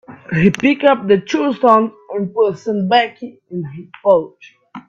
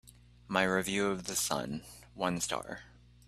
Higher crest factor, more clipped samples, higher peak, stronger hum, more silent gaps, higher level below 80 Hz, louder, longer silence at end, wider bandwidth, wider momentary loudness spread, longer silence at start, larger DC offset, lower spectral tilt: second, 16 dB vs 24 dB; neither; first, 0 dBFS vs -10 dBFS; second, none vs 60 Hz at -55 dBFS; neither; first, -52 dBFS vs -60 dBFS; first, -15 LUFS vs -33 LUFS; second, 0.1 s vs 0.4 s; second, 7.8 kHz vs 15.5 kHz; about the same, 15 LU vs 15 LU; about the same, 0.1 s vs 0.05 s; neither; first, -6.5 dB/octave vs -3 dB/octave